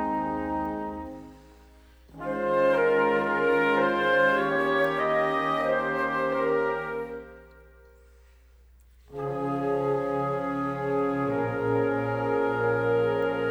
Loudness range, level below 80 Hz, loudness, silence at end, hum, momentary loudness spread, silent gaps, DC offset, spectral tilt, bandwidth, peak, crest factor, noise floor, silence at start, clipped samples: 9 LU; -54 dBFS; -26 LUFS; 0 s; 60 Hz at -55 dBFS; 11 LU; none; under 0.1%; -7 dB/octave; 13 kHz; -12 dBFS; 14 dB; -55 dBFS; 0 s; under 0.1%